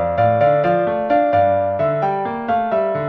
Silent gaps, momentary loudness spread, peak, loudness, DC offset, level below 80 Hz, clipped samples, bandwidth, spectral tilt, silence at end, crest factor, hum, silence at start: none; 5 LU; -4 dBFS; -17 LUFS; under 0.1%; -50 dBFS; under 0.1%; 5.2 kHz; -9 dB/octave; 0 s; 12 dB; none; 0 s